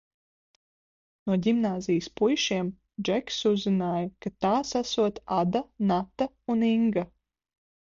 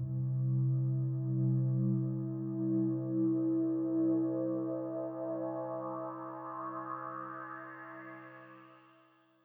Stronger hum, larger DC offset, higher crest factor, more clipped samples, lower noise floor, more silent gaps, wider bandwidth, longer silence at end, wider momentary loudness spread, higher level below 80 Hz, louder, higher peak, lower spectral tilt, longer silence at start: neither; neither; about the same, 16 dB vs 12 dB; neither; first, under -90 dBFS vs -66 dBFS; neither; first, 7.4 kHz vs 2.9 kHz; first, 0.9 s vs 0.65 s; second, 8 LU vs 15 LU; first, -60 dBFS vs -76 dBFS; first, -27 LUFS vs -35 LUFS; first, -12 dBFS vs -22 dBFS; second, -5.5 dB/octave vs -13.5 dB/octave; first, 1.25 s vs 0 s